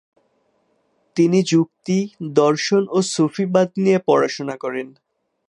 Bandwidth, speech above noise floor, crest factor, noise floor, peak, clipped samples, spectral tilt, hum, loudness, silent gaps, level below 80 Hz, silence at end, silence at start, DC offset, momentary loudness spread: 11 kHz; 47 dB; 18 dB; -65 dBFS; -2 dBFS; under 0.1%; -5.5 dB/octave; none; -19 LUFS; none; -70 dBFS; 0.6 s; 1.15 s; under 0.1%; 10 LU